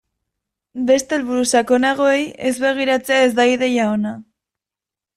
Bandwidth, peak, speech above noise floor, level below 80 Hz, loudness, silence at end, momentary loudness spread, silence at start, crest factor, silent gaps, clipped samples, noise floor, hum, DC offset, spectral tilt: 14.5 kHz; -4 dBFS; 71 dB; -60 dBFS; -17 LUFS; 0.95 s; 8 LU; 0.75 s; 16 dB; none; under 0.1%; -88 dBFS; none; under 0.1%; -3.5 dB/octave